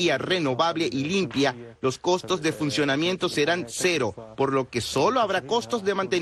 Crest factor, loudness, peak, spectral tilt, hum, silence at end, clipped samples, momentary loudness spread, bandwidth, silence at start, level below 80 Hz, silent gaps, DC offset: 16 dB; -25 LUFS; -10 dBFS; -4 dB/octave; none; 0 s; under 0.1%; 4 LU; 12.5 kHz; 0 s; -58 dBFS; none; under 0.1%